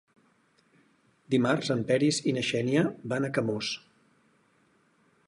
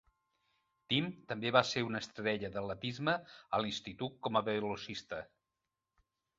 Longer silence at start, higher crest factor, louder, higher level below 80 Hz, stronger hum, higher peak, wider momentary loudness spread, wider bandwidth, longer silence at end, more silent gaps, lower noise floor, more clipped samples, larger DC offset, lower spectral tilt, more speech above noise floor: first, 1.3 s vs 0.9 s; second, 18 dB vs 26 dB; first, -28 LUFS vs -36 LUFS; about the same, -68 dBFS vs -70 dBFS; neither; about the same, -12 dBFS vs -12 dBFS; second, 7 LU vs 12 LU; first, 11.5 kHz vs 7.6 kHz; first, 1.5 s vs 1.15 s; neither; second, -67 dBFS vs -89 dBFS; neither; neither; first, -5 dB/octave vs -3 dB/octave; second, 40 dB vs 53 dB